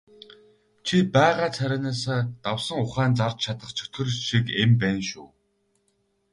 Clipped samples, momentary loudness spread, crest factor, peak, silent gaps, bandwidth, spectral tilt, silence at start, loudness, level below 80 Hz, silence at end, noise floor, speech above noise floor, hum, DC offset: under 0.1%; 11 LU; 18 dB; -6 dBFS; none; 11.5 kHz; -5.5 dB/octave; 0.85 s; -24 LUFS; -56 dBFS; 1.05 s; -70 dBFS; 46 dB; none; under 0.1%